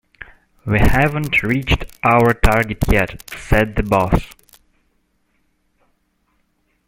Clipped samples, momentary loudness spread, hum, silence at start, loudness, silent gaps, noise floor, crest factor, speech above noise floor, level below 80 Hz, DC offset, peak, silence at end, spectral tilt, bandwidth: under 0.1%; 8 LU; none; 0.2 s; -17 LUFS; none; -64 dBFS; 18 dB; 49 dB; -26 dBFS; under 0.1%; 0 dBFS; 2.6 s; -6.5 dB/octave; 16.5 kHz